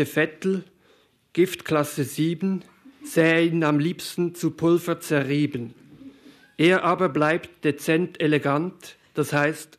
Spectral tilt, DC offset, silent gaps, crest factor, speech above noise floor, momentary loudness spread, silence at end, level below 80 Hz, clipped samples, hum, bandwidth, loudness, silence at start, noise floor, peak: -6 dB/octave; under 0.1%; none; 18 dB; 38 dB; 9 LU; 0.15 s; -68 dBFS; under 0.1%; none; 14 kHz; -23 LUFS; 0 s; -60 dBFS; -6 dBFS